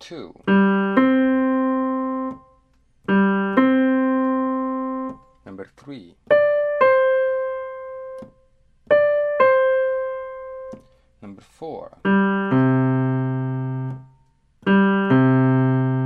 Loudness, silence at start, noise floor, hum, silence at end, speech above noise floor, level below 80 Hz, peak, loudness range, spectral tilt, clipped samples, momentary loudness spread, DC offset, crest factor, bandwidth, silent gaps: -19 LUFS; 0 s; -59 dBFS; none; 0 s; 36 dB; -58 dBFS; -4 dBFS; 2 LU; -9.5 dB/octave; under 0.1%; 19 LU; under 0.1%; 16 dB; 4.6 kHz; none